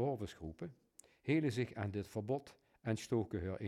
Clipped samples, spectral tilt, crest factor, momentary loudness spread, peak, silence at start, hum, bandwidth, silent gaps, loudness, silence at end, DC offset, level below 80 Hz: under 0.1%; -7 dB/octave; 18 dB; 13 LU; -22 dBFS; 0 s; none; 14.5 kHz; none; -40 LUFS; 0 s; under 0.1%; -68 dBFS